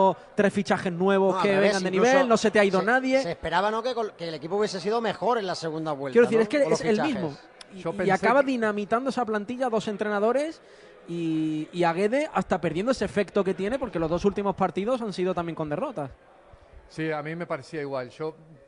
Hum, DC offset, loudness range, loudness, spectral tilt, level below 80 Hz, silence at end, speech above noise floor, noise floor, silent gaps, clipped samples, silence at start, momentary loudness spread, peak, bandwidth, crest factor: none; under 0.1%; 7 LU; -25 LUFS; -5.5 dB/octave; -56 dBFS; 0.1 s; 26 dB; -51 dBFS; none; under 0.1%; 0 s; 12 LU; -8 dBFS; 11 kHz; 18 dB